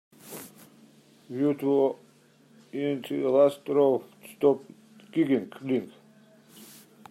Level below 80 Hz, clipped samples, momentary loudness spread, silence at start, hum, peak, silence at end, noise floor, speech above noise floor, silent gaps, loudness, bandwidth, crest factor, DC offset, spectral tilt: -80 dBFS; under 0.1%; 21 LU; 0.25 s; none; -10 dBFS; 1.25 s; -59 dBFS; 34 dB; none; -26 LUFS; 16 kHz; 18 dB; under 0.1%; -7 dB/octave